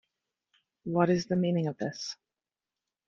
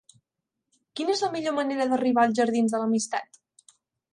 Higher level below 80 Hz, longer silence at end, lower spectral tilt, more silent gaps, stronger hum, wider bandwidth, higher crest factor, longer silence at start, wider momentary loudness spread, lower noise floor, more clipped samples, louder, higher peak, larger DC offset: first, -70 dBFS vs -76 dBFS; about the same, 0.95 s vs 0.9 s; first, -6.5 dB/octave vs -4 dB/octave; neither; neither; second, 7.4 kHz vs 11 kHz; about the same, 22 dB vs 18 dB; about the same, 0.85 s vs 0.95 s; first, 15 LU vs 9 LU; first, under -90 dBFS vs -84 dBFS; neither; second, -30 LUFS vs -25 LUFS; about the same, -10 dBFS vs -10 dBFS; neither